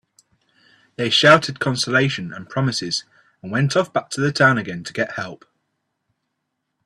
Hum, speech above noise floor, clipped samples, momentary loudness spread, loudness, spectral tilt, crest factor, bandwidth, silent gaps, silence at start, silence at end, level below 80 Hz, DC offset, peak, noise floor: none; 57 dB; under 0.1%; 15 LU; -19 LUFS; -4.5 dB/octave; 22 dB; 12.5 kHz; none; 1 s; 1.5 s; -60 dBFS; under 0.1%; 0 dBFS; -76 dBFS